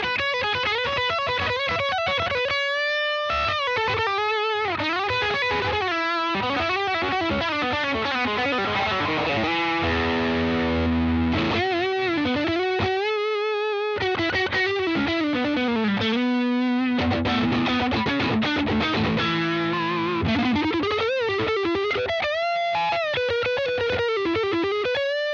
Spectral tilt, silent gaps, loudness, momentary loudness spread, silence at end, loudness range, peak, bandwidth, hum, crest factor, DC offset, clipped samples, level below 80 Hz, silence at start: -5.5 dB/octave; none; -23 LUFS; 2 LU; 0 s; 1 LU; -12 dBFS; 7.4 kHz; none; 12 dB; under 0.1%; under 0.1%; -48 dBFS; 0 s